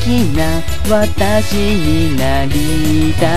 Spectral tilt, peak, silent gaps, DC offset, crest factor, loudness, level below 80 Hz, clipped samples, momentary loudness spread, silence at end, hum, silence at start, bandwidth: -5.5 dB/octave; 0 dBFS; none; 20%; 14 dB; -15 LUFS; -22 dBFS; under 0.1%; 2 LU; 0 s; none; 0 s; 14 kHz